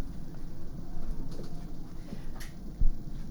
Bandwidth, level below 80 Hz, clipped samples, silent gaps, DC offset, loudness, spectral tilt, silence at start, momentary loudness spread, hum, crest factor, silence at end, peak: 6.8 kHz; -32 dBFS; under 0.1%; none; under 0.1%; -42 LUFS; -6.5 dB/octave; 0 s; 9 LU; none; 18 dB; 0 s; -12 dBFS